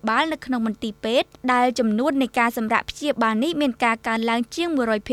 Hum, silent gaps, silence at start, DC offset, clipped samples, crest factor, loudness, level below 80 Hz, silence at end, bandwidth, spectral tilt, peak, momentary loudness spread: none; none; 0.05 s; under 0.1%; under 0.1%; 18 dB; -22 LUFS; -54 dBFS; 0 s; 15 kHz; -4.5 dB/octave; -4 dBFS; 5 LU